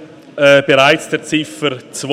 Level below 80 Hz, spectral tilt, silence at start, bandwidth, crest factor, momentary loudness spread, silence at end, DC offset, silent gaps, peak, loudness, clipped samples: -58 dBFS; -4 dB/octave; 0 s; 15 kHz; 14 dB; 13 LU; 0 s; under 0.1%; none; 0 dBFS; -13 LUFS; under 0.1%